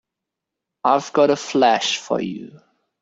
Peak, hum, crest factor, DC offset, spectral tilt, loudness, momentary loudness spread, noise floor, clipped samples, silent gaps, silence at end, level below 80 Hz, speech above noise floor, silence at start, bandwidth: -2 dBFS; none; 18 dB; under 0.1%; -3.5 dB/octave; -19 LUFS; 9 LU; -83 dBFS; under 0.1%; none; 0.45 s; -66 dBFS; 65 dB; 0.85 s; 8 kHz